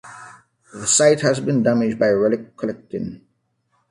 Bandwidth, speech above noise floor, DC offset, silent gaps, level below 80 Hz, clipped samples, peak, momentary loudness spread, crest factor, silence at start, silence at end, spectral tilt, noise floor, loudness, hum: 11.5 kHz; 49 dB; under 0.1%; none; -58 dBFS; under 0.1%; -2 dBFS; 15 LU; 18 dB; 0.05 s; 0.75 s; -4 dB/octave; -68 dBFS; -19 LUFS; none